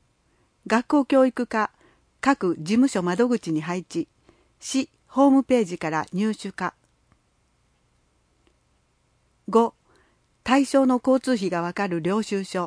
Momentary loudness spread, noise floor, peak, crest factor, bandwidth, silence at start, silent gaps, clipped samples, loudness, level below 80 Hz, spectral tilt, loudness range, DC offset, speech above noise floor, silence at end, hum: 11 LU; -66 dBFS; -6 dBFS; 18 dB; 10.5 kHz; 0.65 s; none; under 0.1%; -23 LUFS; -64 dBFS; -5.5 dB/octave; 8 LU; under 0.1%; 44 dB; 0 s; none